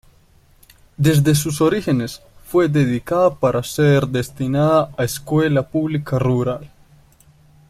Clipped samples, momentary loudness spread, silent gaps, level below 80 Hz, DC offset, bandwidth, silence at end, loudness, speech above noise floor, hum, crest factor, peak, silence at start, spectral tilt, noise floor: under 0.1%; 7 LU; none; -46 dBFS; under 0.1%; 15.5 kHz; 1 s; -18 LUFS; 35 dB; none; 16 dB; -2 dBFS; 1 s; -6.5 dB/octave; -52 dBFS